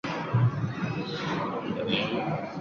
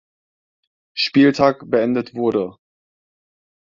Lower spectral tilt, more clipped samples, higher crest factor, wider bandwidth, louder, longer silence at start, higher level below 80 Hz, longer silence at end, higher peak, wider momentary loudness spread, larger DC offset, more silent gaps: about the same, -7 dB/octave vs -6 dB/octave; neither; about the same, 18 dB vs 20 dB; about the same, 7 kHz vs 7.4 kHz; second, -29 LUFS vs -18 LUFS; second, 0.05 s vs 0.95 s; about the same, -58 dBFS vs -58 dBFS; second, 0 s vs 1.1 s; second, -12 dBFS vs 0 dBFS; second, 6 LU vs 11 LU; neither; neither